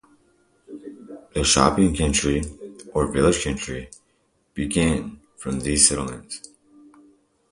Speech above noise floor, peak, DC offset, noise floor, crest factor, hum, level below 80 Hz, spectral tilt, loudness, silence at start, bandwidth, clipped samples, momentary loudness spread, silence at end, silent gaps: 45 dB; 0 dBFS; under 0.1%; -66 dBFS; 24 dB; none; -38 dBFS; -3.5 dB/octave; -21 LUFS; 0.7 s; 11.5 kHz; under 0.1%; 24 LU; 1.15 s; none